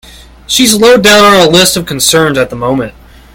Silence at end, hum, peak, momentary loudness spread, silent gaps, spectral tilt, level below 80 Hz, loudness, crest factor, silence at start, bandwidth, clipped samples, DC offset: 0.45 s; none; 0 dBFS; 10 LU; none; -3 dB/octave; -36 dBFS; -6 LUFS; 8 dB; 0.5 s; over 20 kHz; 3%; under 0.1%